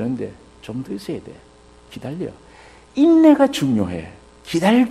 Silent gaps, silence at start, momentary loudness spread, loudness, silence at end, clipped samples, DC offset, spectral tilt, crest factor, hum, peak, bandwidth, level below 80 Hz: none; 0 s; 21 LU; -18 LUFS; 0 s; under 0.1%; under 0.1%; -6.5 dB/octave; 18 dB; none; -2 dBFS; 13 kHz; -52 dBFS